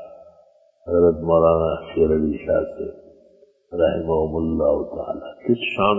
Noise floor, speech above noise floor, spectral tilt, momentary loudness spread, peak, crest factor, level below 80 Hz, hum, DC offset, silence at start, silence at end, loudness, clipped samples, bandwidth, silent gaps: -55 dBFS; 35 dB; -9.5 dB/octave; 13 LU; -4 dBFS; 18 dB; -40 dBFS; none; under 0.1%; 0 s; 0 s; -21 LUFS; under 0.1%; 3.4 kHz; none